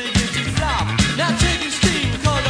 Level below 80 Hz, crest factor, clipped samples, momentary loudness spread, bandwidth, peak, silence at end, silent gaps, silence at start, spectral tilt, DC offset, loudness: -28 dBFS; 16 dB; under 0.1%; 3 LU; 10.5 kHz; -4 dBFS; 0 s; none; 0 s; -4 dB/octave; under 0.1%; -18 LUFS